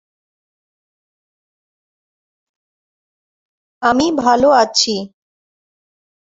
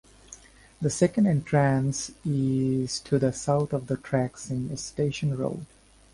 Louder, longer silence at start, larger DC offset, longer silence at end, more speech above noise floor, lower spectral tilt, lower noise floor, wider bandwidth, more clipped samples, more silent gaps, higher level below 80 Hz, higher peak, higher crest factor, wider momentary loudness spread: first, -14 LUFS vs -27 LUFS; first, 3.8 s vs 0.3 s; neither; first, 1.25 s vs 0.5 s; first, over 77 dB vs 25 dB; second, -2.5 dB/octave vs -6 dB/octave; first, under -90 dBFS vs -50 dBFS; second, 8 kHz vs 11.5 kHz; neither; neither; about the same, -54 dBFS vs -54 dBFS; first, 0 dBFS vs -8 dBFS; about the same, 20 dB vs 18 dB; about the same, 10 LU vs 10 LU